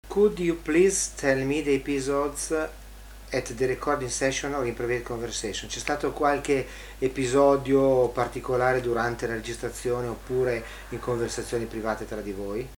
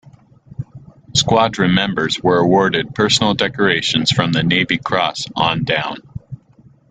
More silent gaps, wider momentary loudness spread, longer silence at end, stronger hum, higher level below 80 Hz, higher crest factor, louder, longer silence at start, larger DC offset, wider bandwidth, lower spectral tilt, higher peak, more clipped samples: neither; second, 11 LU vs 18 LU; second, 0.05 s vs 0.55 s; neither; about the same, -44 dBFS vs -46 dBFS; about the same, 18 dB vs 18 dB; second, -26 LUFS vs -16 LUFS; about the same, 0.05 s vs 0.05 s; neither; first, 19.5 kHz vs 9.4 kHz; about the same, -4.5 dB/octave vs -4 dB/octave; second, -8 dBFS vs 0 dBFS; neither